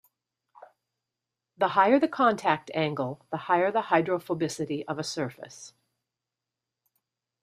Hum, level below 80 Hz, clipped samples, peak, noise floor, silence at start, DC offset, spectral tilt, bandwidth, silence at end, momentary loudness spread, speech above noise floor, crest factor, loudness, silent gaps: none; -74 dBFS; under 0.1%; -8 dBFS; -88 dBFS; 0.6 s; under 0.1%; -5 dB/octave; 14.5 kHz; 1.75 s; 13 LU; 61 dB; 22 dB; -27 LUFS; none